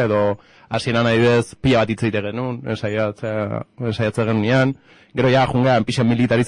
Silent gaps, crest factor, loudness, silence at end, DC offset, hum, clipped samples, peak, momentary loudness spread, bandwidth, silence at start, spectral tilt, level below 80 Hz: none; 12 dB; -19 LUFS; 0 s; under 0.1%; none; under 0.1%; -8 dBFS; 10 LU; 11 kHz; 0 s; -6.5 dB/octave; -48 dBFS